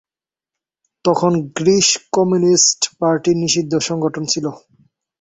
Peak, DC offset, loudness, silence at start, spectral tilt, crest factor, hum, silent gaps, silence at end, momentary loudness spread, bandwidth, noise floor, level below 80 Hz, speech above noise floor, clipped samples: 0 dBFS; under 0.1%; -16 LUFS; 1.05 s; -3.5 dB/octave; 16 dB; none; none; 0.65 s; 8 LU; 8.4 kHz; -89 dBFS; -58 dBFS; 73 dB; under 0.1%